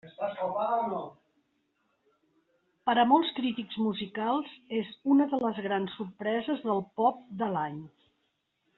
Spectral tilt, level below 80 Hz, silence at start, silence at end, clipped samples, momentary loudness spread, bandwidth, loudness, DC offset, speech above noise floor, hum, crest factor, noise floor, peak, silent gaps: -3.5 dB/octave; -74 dBFS; 0.05 s; 0.9 s; under 0.1%; 10 LU; 4.2 kHz; -30 LUFS; under 0.1%; 48 dB; none; 20 dB; -77 dBFS; -10 dBFS; none